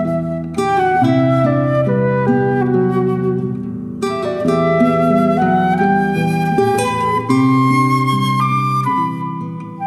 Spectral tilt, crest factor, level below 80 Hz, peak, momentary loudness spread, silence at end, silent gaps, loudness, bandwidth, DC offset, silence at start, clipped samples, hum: -7.5 dB/octave; 12 dB; -48 dBFS; -2 dBFS; 8 LU; 0 s; none; -15 LUFS; 13.5 kHz; under 0.1%; 0 s; under 0.1%; none